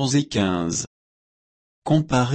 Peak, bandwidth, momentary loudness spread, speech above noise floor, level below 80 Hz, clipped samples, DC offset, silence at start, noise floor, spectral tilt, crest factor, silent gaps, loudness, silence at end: -8 dBFS; 8.8 kHz; 14 LU; over 69 dB; -50 dBFS; under 0.1%; under 0.1%; 0 s; under -90 dBFS; -5 dB/octave; 16 dB; 0.87-1.82 s; -22 LUFS; 0 s